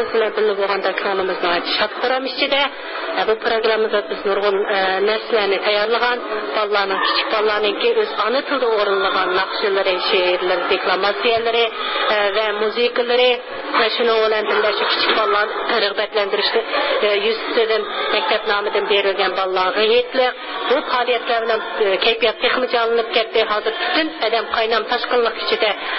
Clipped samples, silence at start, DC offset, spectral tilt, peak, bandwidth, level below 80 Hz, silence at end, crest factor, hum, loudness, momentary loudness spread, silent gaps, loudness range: under 0.1%; 0 s; under 0.1%; -7 dB/octave; -4 dBFS; 5.8 kHz; -58 dBFS; 0 s; 14 dB; none; -18 LUFS; 4 LU; none; 2 LU